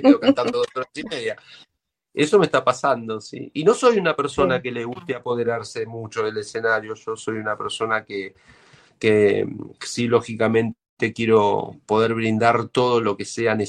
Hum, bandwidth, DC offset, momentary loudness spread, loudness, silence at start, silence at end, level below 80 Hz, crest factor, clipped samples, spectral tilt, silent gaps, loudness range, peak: none; 10.5 kHz; under 0.1%; 13 LU; -21 LUFS; 0 s; 0 s; -58 dBFS; 20 dB; under 0.1%; -5.5 dB/octave; 10.89-10.97 s; 5 LU; -2 dBFS